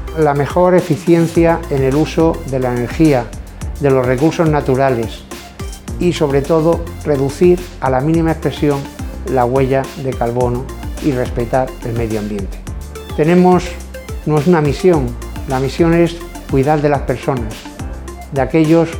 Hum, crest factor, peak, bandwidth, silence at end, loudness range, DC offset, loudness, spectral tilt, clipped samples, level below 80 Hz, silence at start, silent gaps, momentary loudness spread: none; 14 dB; 0 dBFS; 19.5 kHz; 0 s; 3 LU; under 0.1%; -15 LUFS; -7 dB/octave; under 0.1%; -30 dBFS; 0 s; none; 15 LU